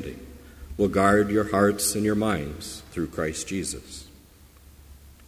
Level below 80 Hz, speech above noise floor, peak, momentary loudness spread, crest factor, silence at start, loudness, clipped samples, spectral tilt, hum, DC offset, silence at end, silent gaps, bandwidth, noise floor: -46 dBFS; 27 dB; -6 dBFS; 21 LU; 20 dB; 0 s; -24 LUFS; under 0.1%; -4.5 dB/octave; none; under 0.1%; 0.15 s; none; 16 kHz; -52 dBFS